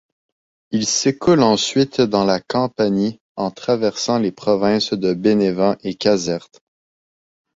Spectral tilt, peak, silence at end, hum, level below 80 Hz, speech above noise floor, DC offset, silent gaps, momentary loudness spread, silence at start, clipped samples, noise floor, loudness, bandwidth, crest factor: -4.5 dB/octave; -2 dBFS; 1.15 s; none; -54 dBFS; over 72 dB; under 0.1%; 3.21-3.35 s; 8 LU; 0.7 s; under 0.1%; under -90 dBFS; -18 LUFS; 8 kHz; 18 dB